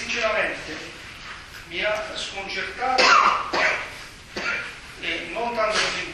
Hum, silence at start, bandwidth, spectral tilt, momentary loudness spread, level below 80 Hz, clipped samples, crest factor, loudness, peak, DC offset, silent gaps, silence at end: none; 0 s; 13 kHz; -1.5 dB/octave; 20 LU; -50 dBFS; under 0.1%; 22 dB; -22 LUFS; -2 dBFS; under 0.1%; none; 0 s